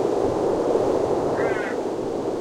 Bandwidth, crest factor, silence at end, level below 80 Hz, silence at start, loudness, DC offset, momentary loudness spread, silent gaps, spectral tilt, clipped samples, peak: 13 kHz; 14 dB; 0 s; -50 dBFS; 0 s; -23 LUFS; under 0.1%; 5 LU; none; -6.5 dB/octave; under 0.1%; -10 dBFS